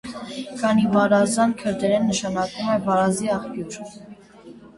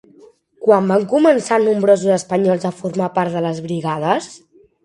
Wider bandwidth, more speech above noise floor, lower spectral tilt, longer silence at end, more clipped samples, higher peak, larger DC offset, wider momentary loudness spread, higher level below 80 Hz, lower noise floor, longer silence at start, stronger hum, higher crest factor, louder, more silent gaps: about the same, 11.5 kHz vs 11.5 kHz; second, 24 dB vs 32 dB; about the same, -5 dB/octave vs -6 dB/octave; second, 0.1 s vs 0.45 s; neither; second, -6 dBFS vs 0 dBFS; neither; first, 15 LU vs 8 LU; first, -56 dBFS vs -62 dBFS; about the same, -45 dBFS vs -48 dBFS; second, 0.05 s vs 0.6 s; neither; about the same, 16 dB vs 16 dB; second, -21 LUFS vs -17 LUFS; neither